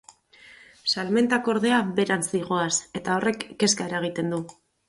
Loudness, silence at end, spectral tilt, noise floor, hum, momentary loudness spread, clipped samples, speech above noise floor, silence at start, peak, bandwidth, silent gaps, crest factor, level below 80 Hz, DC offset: -24 LUFS; 0.35 s; -3.5 dB/octave; -52 dBFS; none; 7 LU; under 0.1%; 28 dB; 0.45 s; -8 dBFS; 11.5 kHz; none; 18 dB; -64 dBFS; under 0.1%